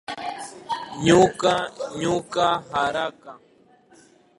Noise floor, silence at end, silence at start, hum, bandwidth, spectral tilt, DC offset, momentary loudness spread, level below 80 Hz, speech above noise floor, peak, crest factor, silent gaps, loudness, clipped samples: -55 dBFS; 1 s; 0.1 s; none; 11.5 kHz; -4.5 dB/octave; under 0.1%; 15 LU; -56 dBFS; 34 dB; -2 dBFS; 22 dB; none; -23 LUFS; under 0.1%